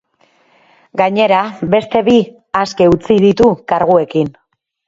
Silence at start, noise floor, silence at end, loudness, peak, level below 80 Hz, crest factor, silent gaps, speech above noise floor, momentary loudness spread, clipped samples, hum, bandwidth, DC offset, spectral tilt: 0.95 s; -55 dBFS; 0.6 s; -13 LUFS; 0 dBFS; -44 dBFS; 14 dB; none; 43 dB; 8 LU; under 0.1%; none; 7.8 kHz; under 0.1%; -6.5 dB/octave